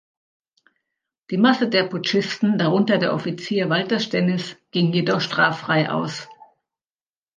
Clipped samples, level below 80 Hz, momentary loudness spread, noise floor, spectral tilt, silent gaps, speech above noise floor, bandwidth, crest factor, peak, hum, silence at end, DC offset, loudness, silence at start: under 0.1%; -68 dBFS; 8 LU; under -90 dBFS; -6 dB/octave; none; over 70 dB; 9 kHz; 20 dB; -2 dBFS; none; 0.9 s; under 0.1%; -21 LUFS; 1.3 s